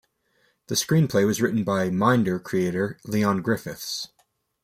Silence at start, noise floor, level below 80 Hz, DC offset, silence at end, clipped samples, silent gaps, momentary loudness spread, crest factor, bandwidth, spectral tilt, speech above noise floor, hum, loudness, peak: 0.7 s; -68 dBFS; -60 dBFS; under 0.1%; 0.6 s; under 0.1%; none; 10 LU; 18 dB; 16 kHz; -5.5 dB/octave; 45 dB; none; -24 LUFS; -6 dBFS